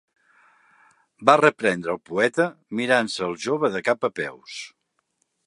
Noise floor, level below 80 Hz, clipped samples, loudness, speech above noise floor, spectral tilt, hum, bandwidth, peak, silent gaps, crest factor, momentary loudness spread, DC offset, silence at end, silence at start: -72 dBFS; -68 dBFS; under 0.1%; -22 LUFS; 50 dB; -4.5 dB/octave; none; 11.5 kHz; 0 dBFS; none; 24 dB; 16 LU; under 0.1%; 0.8 s; 1.2 s